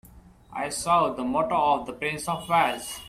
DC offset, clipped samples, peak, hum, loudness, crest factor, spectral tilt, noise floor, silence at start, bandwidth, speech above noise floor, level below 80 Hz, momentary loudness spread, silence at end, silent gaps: under 0.1%; under 0.1%; -10 dBFS; none; -25 LUFS; 18 dB; -3.5 dB/octave; -50 dBFS; 0.1 s; 16 kHz; 25 dB; -54 dBFS; 8 LU; 0 s; none